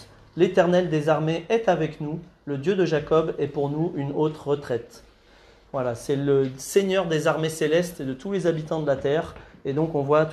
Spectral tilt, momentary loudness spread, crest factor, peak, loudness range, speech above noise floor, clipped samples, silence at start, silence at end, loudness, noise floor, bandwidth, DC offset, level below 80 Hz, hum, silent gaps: -6 dB/octave; 10 LU; 18 dB; -6 dBFS; 3 LU; 30 dB; under 0.1%; 0 s; 0 s; -24 LUFS; -53 dBFS; 13.5 kHz; under 0.1%; -56 dBFS; none; none